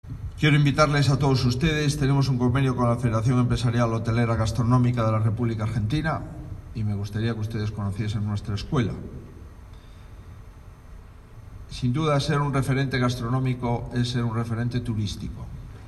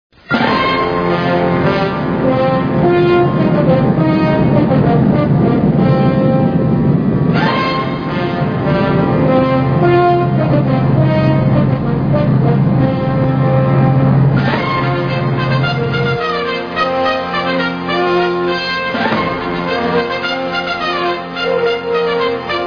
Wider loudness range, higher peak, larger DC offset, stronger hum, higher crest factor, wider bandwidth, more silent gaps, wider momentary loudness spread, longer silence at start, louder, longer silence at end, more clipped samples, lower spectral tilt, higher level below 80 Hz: first, 10 LU vs 4 LU; second, -4 dBFS vs 0 dBFS; neither; neither; first, 20 dB vs 12 dB; first, 12.5 kHz vs 5.4 kHz; neither; first, 16 LU vs 5 LU; second, 0.05 s vs 0.3 s; second, -24 LUFS vs -14 LUFS; about the same, 0 s vs 0 s; neither; second, -6.5 dB/octave vs -8.5 dB/octave; about the same, -40 dBFS vs -36 dBFS